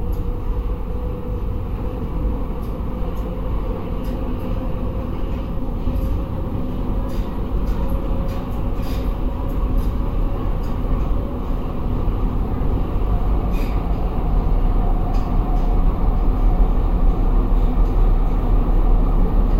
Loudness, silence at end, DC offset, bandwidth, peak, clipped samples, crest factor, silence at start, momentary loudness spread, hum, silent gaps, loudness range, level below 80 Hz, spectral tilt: -24 LUFS; 0 s; 0.3%; 5 kHz; -4 dBFS; under 0.1%; 14 dB; 0 s; 6 LU; none; none; 5 LU; -20 dBFS; -9 dB/octave